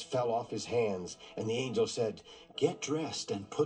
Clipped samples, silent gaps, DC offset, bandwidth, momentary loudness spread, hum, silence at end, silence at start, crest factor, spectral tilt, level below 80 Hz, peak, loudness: under 0.1%; none; under 0.1%; 10 kHz; 8 LU; none; 0 s; 0 s; 18 dB; -4.5 dB/octave; -74 dBFS; -16 dBFS; -34 LUFS